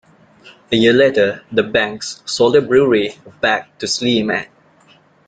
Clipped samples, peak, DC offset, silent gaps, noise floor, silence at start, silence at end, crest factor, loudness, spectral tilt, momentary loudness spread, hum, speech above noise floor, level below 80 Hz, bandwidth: under 0.1%; -2 dBFS; under 0.1%; none; -51 dBFS; 0.45 s; 0.85 s; 16 dB; -16 LUFS; -4 dB/octave; 11 LU; none; 35 dB; -52 dBFS; 9.4 kHz